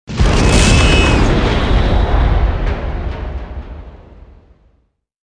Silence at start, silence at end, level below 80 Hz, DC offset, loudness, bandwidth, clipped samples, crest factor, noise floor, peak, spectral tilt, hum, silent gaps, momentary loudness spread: 0.1 s; 1.3 s; -16 dBFS; under 0.1%; -14 LUFS; 10.5 kHz; under 0.1%; 14 dB; -60 dBFS; 0 dBFS; -5 dB/octave; none; none; 18 LU